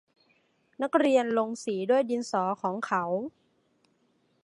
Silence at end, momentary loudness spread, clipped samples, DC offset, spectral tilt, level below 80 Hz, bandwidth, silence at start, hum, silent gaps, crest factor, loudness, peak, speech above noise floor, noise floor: 1.15 s; 9 LU; under 0.1%; under 0.1%; -5.5 dB/octave; -80 dBFS; 11.5 kHz; 0.8 s; none; none; 20 dB; -28 LUFS; -8 dBFS; 43 dB; -70 dBFS